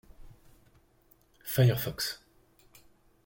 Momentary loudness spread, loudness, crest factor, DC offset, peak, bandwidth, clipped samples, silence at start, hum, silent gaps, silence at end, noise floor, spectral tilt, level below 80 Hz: 19 LU; -29 LUFS; 20 dB; under 0.1%; -14 dBFS; 17 kHz; under 0.1%; 0.2 s; none; none; 1.1 s; -65 dBFS; -5.5 dB/octave; -58 dBFS